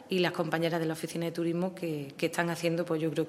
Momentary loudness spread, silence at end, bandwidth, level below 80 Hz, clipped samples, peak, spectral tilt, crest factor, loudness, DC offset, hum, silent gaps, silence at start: 5 LU; 0 s; 16 kHz; -76 dBFS; under 0.1%; -10 dBFS; -5.5 dB/octave; 20 dB; -32 LUFS; under 0.1%; none; none; 0 s